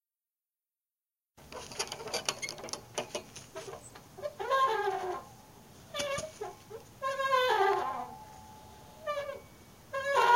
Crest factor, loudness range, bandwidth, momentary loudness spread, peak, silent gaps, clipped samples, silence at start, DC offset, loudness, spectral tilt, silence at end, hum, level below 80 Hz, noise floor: 24 dB; 6 LU; 16.5 kHz; 23 LU; -10 dBFS; none; under 0.1%; 1.4 s; under 0.1%; -34 LUFS; -2 dB/octave; 0 s; none; -66 dBFS; under -90 dBFS